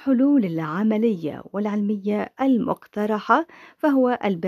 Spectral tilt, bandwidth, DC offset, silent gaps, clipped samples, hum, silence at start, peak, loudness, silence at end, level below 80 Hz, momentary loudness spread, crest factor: -8.5 dB/octave; 13 kHz; under 0.1%; none; under 0.1%; none; 0 s; -4 dBFS; -22 LUFS; 0 s; -68 dBFS; 8 LU; 18 dB